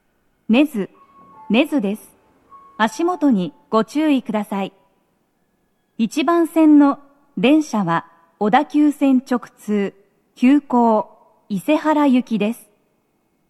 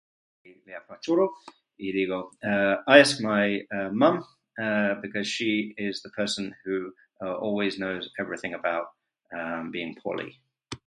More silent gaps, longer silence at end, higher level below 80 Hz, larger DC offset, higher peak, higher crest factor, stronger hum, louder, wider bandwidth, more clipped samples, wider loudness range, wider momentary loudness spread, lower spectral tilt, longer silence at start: neither; first, 0.95 s vs 0.1 s; about the same, -72 dBFS vs -68 dBFS; neither; about the same, 0 dBFS vs 0 dBFS; second, 18 dB vs 26 dB; neither; first, -18 LUFS vs -26 LUFS; first, 13 kHz vs 11.5 kHz; neither; second, 5 LU vs 8 LU; second, 11 LU vs 15 LU; first, -6 dB/octave vs -4.5 dB/octave; about the same, 0.5 s vs 0.45 s